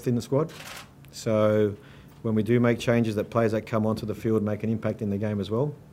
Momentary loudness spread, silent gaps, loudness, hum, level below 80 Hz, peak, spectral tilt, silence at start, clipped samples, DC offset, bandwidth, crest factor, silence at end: 12 LU; none; -26 LUFS; none; -58 dBFS; -8 dBFS; -7.5 dB/octave; 0 s; under 0.1%; under 0.1%; 15.5 kHz; 18 dB; 0.2 s